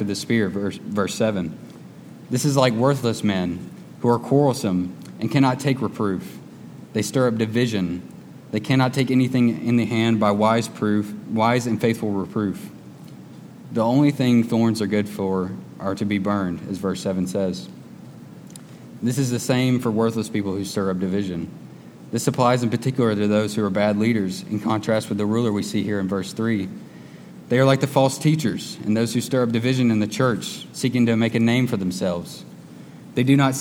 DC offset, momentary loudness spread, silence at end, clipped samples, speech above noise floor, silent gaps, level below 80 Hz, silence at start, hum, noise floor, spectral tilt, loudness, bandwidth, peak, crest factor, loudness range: under 0.1%; 22 LU; 0 s; under 0.1%; 20 dB; none; -62 dBFS; 0 s; none; -41 dBFS; -6 dB/octave; -22 LUFS; 17 kHz; -2 dBFS; 20 dB; 4 LU